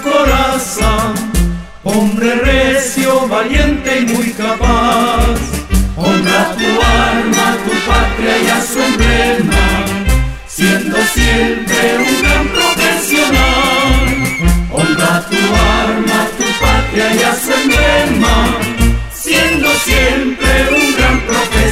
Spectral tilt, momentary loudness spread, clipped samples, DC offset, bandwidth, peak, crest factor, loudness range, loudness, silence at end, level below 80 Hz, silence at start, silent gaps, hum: -4 dB/octave; 5 LU; under 0.1%; under 0.1%; 16.5 kHz; 0 dBFS; 10 dB; 2 LU; -11 LUFS; 0 s; -18 dBFS; 0 s; none; none